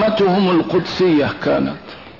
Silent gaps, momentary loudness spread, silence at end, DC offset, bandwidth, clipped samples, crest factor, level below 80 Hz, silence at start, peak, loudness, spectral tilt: none; 6 LU; 0.05 s; 0.3%; 6 kHz; under 0.1%; 10 dB; -48 dBFS; 0 s; -6 dBFS; -16 LUFS; -7 dB/octave